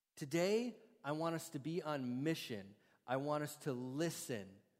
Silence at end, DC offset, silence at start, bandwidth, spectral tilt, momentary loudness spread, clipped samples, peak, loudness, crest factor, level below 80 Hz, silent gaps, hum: 0.2 s; under 0.1%; 0.15 s; 16 kHz; -5 dB/octave; 10 LU; under 0.1%; -24 dBFS; -42 LUFS; 18 dB; -86 dBFS; none; none